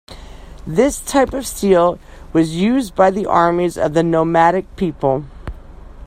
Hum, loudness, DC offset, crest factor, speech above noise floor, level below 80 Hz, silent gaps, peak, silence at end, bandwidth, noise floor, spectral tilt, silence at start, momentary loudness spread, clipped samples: none; -16 LUFS; under 0.1%; 16 dB; 20 dB; -38 dBFS; none; 0 dBFS; 0 s; 16 kHz; -36 dBFS; -6 dB/octave; 0.1 s; 10 LU; under 0.1%